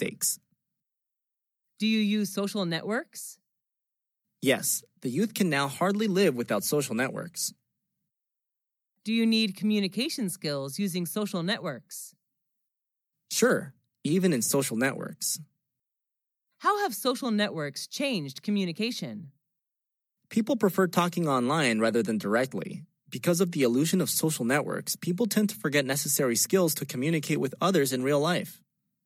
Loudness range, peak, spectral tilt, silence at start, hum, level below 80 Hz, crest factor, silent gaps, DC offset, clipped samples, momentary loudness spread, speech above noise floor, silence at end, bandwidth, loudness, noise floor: 5 LU; -10 dBFS; -4 dB/octave; 0 s; none; -84 dBFS; 18 dB; none; under 0.1%; under 0.1%; 9 LU; 60 dB; 0.5 s; 16.5 kHz; -27 LUFS; -87 dBFS